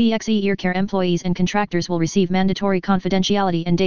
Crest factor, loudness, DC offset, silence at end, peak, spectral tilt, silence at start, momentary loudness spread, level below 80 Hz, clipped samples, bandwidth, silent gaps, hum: 16 dB; -20 LUFS; 2%; 0 s; -4 dBFS; -6 dB/octave; 0 s; 3 LU; -46 dBFS; under 0.1%; 7.2 kHz; none; none